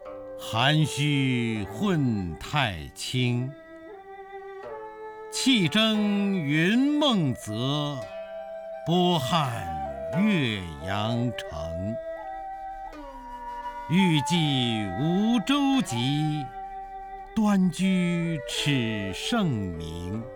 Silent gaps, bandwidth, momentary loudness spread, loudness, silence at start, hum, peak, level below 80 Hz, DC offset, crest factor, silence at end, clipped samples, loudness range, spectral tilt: none; 19.5 kHz; 17 LU; -26 LUFS; 0 s; none; -10 dBFS; -52 dBFS; under 0.1%; 16 dB; 0 s; under 0.1%; 5 LU; -5.5 dB/octave